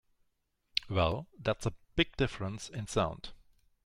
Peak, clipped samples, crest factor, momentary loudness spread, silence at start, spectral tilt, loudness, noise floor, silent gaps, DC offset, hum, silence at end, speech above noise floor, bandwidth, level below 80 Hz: -10 dBFS; under 0.1%; 26 dB; 9 LU; 0.75 s; -5 dB/octave; -34 LUFS; -78 dBFS; none; under 0.1%; none; 0.5 s; 45 dB; 12.5 kHz; -50 dBFS